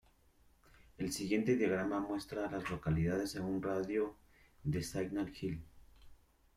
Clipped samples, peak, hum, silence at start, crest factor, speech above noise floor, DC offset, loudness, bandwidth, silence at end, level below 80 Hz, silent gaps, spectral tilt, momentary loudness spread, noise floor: under 0.1%; -20 dBFS; none; 1 s; 18 dB; 32 dB; under 0.1%; -38 LUFS; 16 kHz; 0.4 s; -58 dBFS; none; -6 dB/octave; 9 LU; -68 dBFS